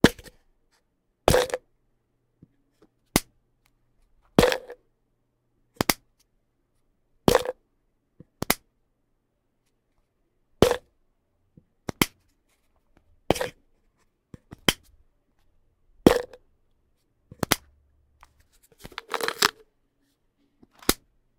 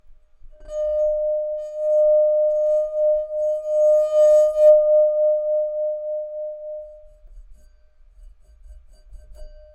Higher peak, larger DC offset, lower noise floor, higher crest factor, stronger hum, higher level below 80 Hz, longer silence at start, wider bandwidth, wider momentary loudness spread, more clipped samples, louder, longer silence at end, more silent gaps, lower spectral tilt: first, 0 dBFS vs -4 dBFS; neither; first, -73 dBFS vs -51 dBFS; first, 30 dB vs 16 dB; neither; about the same, -46 dBFS vs -48 dBFS; about the same, 0.05 s vs 0.1 s; first, 17.5 kHz vs 8.4 kHz; about the same, 17 LU vs 16 LU; neither; second, -25 LUFS vs -19 LUFS; first, 0.45 s vs 0.2 s; neither; about the same, -4 dB/octave vs -3.5 dB/octave